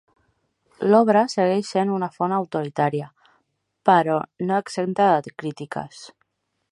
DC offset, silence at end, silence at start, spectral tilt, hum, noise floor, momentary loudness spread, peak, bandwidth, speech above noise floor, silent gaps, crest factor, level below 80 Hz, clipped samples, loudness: under 0.1%; 0.65 s; 0.8 s; -6.5 dB/octave; none; -71 dBFS; 14 LU; -2 dBFS; 11.5 kHz; 50 dB; none; 20 dB; -72 dBFS; under 0.1%; -22 LUFS